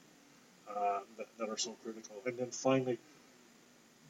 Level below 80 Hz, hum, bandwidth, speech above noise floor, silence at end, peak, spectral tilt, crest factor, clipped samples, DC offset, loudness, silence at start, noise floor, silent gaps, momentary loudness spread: -90 dBFS; none; 16 kHz; 26 dB; 0 s; -18 dBFS; -4 dB/octave; 22 dB; under 0.1%; under 0.1%; -38 LUFS; 0.65 s; -64 dBFS; none; 15 LU